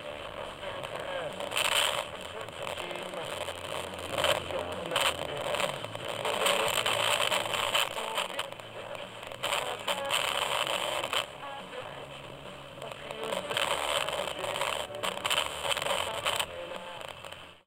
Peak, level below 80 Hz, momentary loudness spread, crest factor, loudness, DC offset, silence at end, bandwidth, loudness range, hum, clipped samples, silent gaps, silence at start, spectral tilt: -12 dBFS; -62 dBFS; 14 LU; 20 dB; -31 LUFS; under 0.1%; 0.1 s; 17 kHz; 5 LU; none; under 0.1%; none; 0 s; -1.5 dB/octave